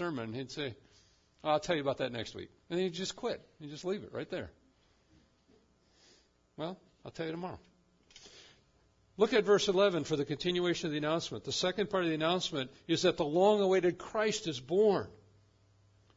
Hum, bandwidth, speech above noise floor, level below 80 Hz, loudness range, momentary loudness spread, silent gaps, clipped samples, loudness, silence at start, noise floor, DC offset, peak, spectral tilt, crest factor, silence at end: none; 7.8 kHz; 36 dB; -68 dBFS; 15 LU; 16 LU; none; under 0.1%; -33 LUFS; 0 s; -69 dBFS; under 0.1%; -14 dBFS; -4.5 dB/octave; 20 dB; 1 s